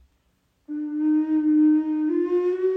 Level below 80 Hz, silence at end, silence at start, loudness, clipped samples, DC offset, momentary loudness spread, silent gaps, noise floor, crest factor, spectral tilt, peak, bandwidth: -68 dBFS; 0 s; 0.7 s; -22 LUFS; under 0.1%; under 0.1%; 11 LU; none; -68 dBFS; 10 dB; -7.5 dB/octave; -12 dBFS; 3.3 kHz